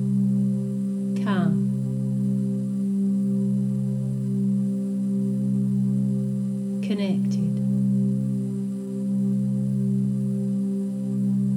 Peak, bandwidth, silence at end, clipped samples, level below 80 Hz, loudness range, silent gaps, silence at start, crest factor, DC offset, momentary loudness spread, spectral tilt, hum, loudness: -12 dBFS; 11 kHz; 0 s; under 0.1%; -68 dBFS; 1 LU; none; 0 s; 12 dB; under 0.1%; 4 LU; -9 dB/octave; none; -25 LUFS